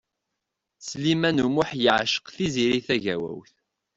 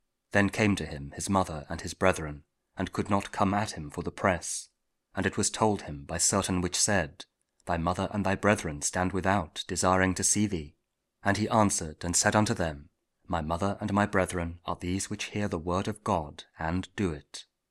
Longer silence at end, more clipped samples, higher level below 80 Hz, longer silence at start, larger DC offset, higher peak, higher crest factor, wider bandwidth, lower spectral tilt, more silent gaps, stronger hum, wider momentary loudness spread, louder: first, 0.55 s vs 0.3 s; neither; second, -58 dBFS vs -50 dBFS; first, 0.8 s vs 0.35 s; neither; about the same, -4 dBFS vs -6 dBFS; about the same, 22 dB vs 24 dB; second, 8 kHz vs 15.5 kHz; about the same, -4.5 dB/octave vs -4 dB/octave; neither; neither; about the same, 14 LU vs 12 LU; first, -24 LUFS vs -29 LUFS